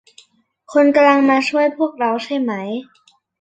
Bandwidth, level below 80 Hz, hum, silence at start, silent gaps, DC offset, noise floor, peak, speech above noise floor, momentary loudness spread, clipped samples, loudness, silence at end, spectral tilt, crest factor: 8.6 kHz; -66 dBFS; none; 0.7 s; none; under 0.1%; -53 dBFS; -2 dBFS; 38 dB; 12 LU; under 0.1%; -16 LUFS; 0.6 s; -5 dB/octave; 16 dB